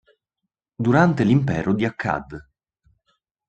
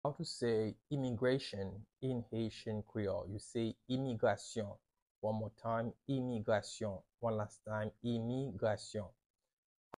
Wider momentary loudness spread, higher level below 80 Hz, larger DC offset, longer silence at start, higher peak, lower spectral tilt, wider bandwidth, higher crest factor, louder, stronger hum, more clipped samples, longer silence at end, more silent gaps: first, 14 LU vs 8 LU; first, -52 dBFS vs -68 dBFS; neither; first, 0.8 s vs 0.05 s; first, -4 dBFS vs -22 dBFS; first, -8 dB/octave vs -6.5 dB/octave; second, 8.6 kHz vs 11.5 kHz; about the same, 20 dB vs 18 dB; first, -20 LUFS vs -40 LUFS; neither; neither; first, 1.05 s vs 0.9 s; second, none vs 5.02-5.22 s